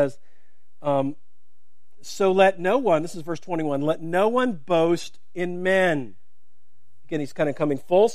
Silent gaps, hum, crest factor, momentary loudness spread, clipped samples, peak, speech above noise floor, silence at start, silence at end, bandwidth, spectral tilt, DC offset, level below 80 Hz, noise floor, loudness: none; none; 20 dB; 13 LU; under 0.1%; -4 dBFS; 52 dB; 0 s; 0 s; 14.5 kHz; -6 dB/octave; 2%; -68 dBFS; -74 dBFS; -23 LUFS